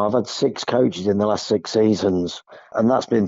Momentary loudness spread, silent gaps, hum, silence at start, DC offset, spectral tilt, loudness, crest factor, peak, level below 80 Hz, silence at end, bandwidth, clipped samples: 7 LU; none; none; 0 s; under 0.1%; -5.5 dB/octave; -20 LUFS; 14 dB; -6 dBFS; -58 dBFS; 0 s; 7.8 kHz; under 0.1%